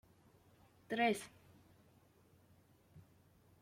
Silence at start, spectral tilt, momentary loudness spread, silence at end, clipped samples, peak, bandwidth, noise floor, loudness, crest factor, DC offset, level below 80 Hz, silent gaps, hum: 0.9 s; -4 dB/octave; 29 LU; 0.6 s; under 0.1%; -22 dBFS; 16.5 kHz; -69 dBFS; -38 LUFS; 22 dB; under 0.1%; -80 dBFS; none; none